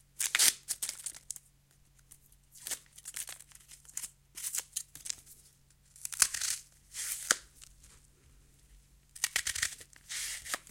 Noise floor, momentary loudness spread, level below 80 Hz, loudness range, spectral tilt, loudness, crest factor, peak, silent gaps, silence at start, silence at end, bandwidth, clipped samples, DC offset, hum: -66 dBFS; 19 LU; -66 dBFS; 8 LU; 2 dB/octave; -34 LUFS; 34 dB; -4 dBFS; none; 0.2 s; 0.1 s; 17 kHz; under 0.1%; under 0.1%; none